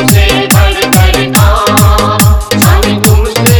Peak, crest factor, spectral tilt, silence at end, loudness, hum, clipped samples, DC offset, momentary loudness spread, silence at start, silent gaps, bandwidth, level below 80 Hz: 0 dBFS; 6 dB; -4.5 dB/octave; 0 s; -7 LUFS; none; 3%; under 0.1%; 1 LU; 0 s; none; over 20 kHz; -12 dBFS